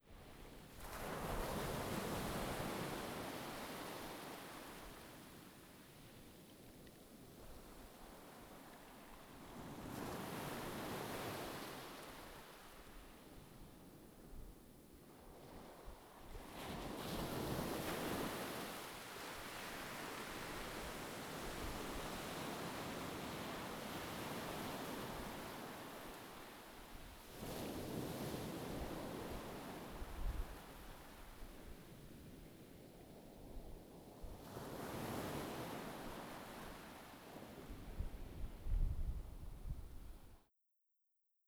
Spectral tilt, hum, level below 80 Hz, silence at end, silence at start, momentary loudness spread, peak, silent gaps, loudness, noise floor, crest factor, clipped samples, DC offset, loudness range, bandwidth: -4.5 dB/octave; none; -54 dBFS; 1.05 s; 0.05 s; 16 LU; -26 dBFS; none; -49 LUFS; -84 dBFS; 22 dB; under 0.1%; under 0.1%; 13 LU; over 20 kHz